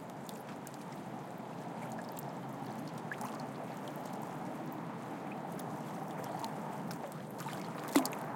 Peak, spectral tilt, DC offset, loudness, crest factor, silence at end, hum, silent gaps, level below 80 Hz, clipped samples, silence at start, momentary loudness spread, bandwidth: -14 dBFS; -5 dB/octave; under 0.1%; -41 LUFS; 28 dB; 0 s; none; none; -82 dBFS; under 0.1%; 0 s; 5 LU; 17 kHz